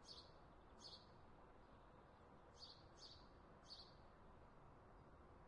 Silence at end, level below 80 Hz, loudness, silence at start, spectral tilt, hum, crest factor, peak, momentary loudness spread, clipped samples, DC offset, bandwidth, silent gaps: 0 s; -72 dBFS; -64 LUFS; 0 s; -4 dB/octave; none; 18 dB; -46 dBFS; 7 LU; under 0.1%; under 0.1%; 10.5 kHz; none